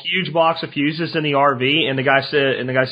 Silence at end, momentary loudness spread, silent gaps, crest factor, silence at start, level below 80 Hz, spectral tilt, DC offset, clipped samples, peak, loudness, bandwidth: 0 s; 5 LU; none; 18 dB; 0 s; -64 dBFS; -7.5 dB/octave; under 0.1%; under 0.1%; 0 dBFS; -17 LUFS; 5.2 kHz